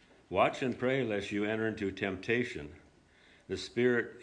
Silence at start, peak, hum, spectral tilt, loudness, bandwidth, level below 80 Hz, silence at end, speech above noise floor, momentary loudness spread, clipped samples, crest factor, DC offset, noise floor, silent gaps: 0.3 s; -14 dBFS; none; -6 dB/octave; -33 LUFS; 10 kHz; -64 dBFS; 0 s; 30 dB; 10 LU; under 0.1%; 20 dB; under 0.1%; -62 dBFS; none